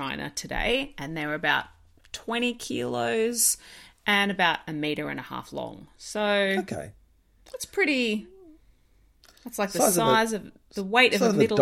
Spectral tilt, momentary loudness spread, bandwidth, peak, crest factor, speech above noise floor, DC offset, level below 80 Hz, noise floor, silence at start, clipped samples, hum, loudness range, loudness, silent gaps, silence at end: -3 dB/octave; 17 LU; 16.5 kHz; -6 dBFS; 22 dB; 35 dB; under 0.1%; -52 dBFS; -61 dBFS; 0 s; under 0.1%; none; 4 LU; -25 LUFS; none; 0 s